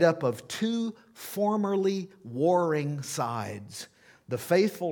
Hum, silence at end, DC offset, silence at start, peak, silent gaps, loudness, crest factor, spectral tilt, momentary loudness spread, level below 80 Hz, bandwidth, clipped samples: none; 0 s; under 0.1%; 0 s; -8 dBFS; none; -29 LUFS; 20 dB; -5.5 dB/octave; 14 LU; -76 dBFS; 19 kHz; under 0.1%